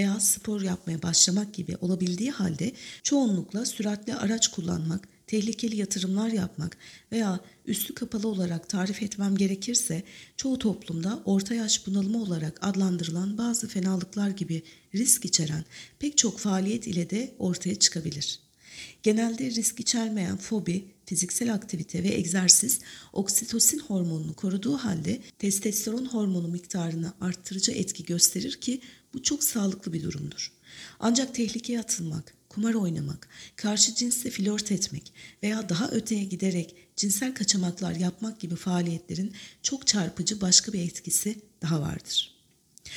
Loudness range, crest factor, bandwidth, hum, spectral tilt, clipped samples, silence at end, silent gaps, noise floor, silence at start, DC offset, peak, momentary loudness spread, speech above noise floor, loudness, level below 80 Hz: 5 LU; 26 dB; 18.5 kHz; none; -3.5 dB/octave; under 0.1%; 0 s; none; -60 dBFS; 0 s; under 0.1%; -2 dBFS; 12 LU; 32 dB; -27 LUFS; -62 dBFS